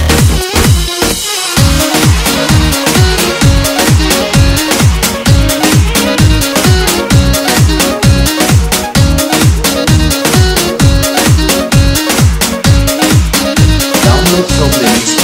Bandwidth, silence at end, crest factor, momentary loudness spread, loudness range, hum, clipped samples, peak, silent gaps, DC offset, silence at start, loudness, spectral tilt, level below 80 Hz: 20 kHz; 0 s; 8 dB; 2 LU; 0 LU; none; 1%; 0 dBFS; none; under 0.1%; 0 s; -8 LUFS; -4 dB/octave; -16 dBFS